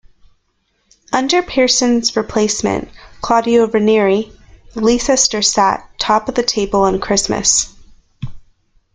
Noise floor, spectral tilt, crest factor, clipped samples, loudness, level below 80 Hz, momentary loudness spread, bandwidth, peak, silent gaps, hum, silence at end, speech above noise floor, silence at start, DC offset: -64 dBFS; -2.5 dB/octave; 16 dB; under 0.1%; -14 LUFS; -40 dBFS; 16 LU; 10 kHz; 0 dBFS; none; none; 0.55 s; 50 dB; 1.1 s; under 0.1%